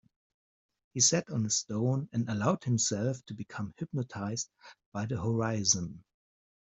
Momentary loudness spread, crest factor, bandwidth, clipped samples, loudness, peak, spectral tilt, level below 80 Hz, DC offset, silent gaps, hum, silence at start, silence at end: 15 LU; 22 dB; 8.2 kHz; under 0.1%; -31 LUFS; -10 dBFS; -4 dB/octave; -66 dBFS; under 0.1%; 4.86-4.92 s; none; 0.95 s; 0.6 s